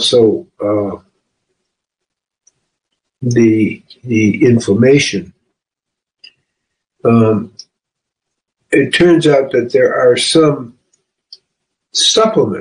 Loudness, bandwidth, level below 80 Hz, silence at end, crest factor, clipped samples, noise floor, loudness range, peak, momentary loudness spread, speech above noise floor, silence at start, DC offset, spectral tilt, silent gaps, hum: -12 LUFS; 10 kHz; -52 dBFS; 0 s; 14 dB; under 0.1%; -81 dBFS; 7 LU; 0 dBFS; 13 LU; 70 dB; 0 s; under 0.1%; -5 dB/octave; none; none